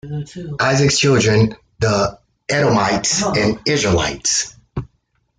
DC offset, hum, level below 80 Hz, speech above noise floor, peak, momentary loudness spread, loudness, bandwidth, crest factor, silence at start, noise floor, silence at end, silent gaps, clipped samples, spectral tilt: under 0.1%; none; -42 dBFS; 48 dB; -4 dBFS; 15 LU; -16 LUFS; 10 kHz; 14 dB; 0.05 s; -65 dBFS; 0.55 s; none; under 0.1%; -4 dB/octave